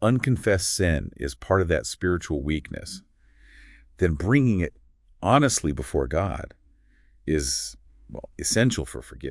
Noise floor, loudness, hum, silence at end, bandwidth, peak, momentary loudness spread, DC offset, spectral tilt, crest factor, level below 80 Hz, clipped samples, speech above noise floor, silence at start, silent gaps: -58 dBFS; -24 LUFS; none; 0 s; 12 kHz; -2 dBFS; 15 LU; under 0.1%; -5 dB/octave; 22 dB; -40 dBFS; under 0.1%; 34 dB; 0 s; none